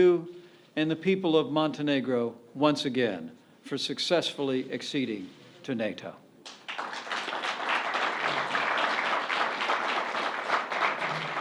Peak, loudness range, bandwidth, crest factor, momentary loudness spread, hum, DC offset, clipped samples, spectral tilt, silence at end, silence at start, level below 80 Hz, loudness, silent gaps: -10 dBFS; 5 LU; 12.5 kHz; 20 dB; 12 LU; none; under 0.1%; under 0.1%; -4.5 dB/octave; 0 s; 0 s; -80 dBFS; -29 LUFS; none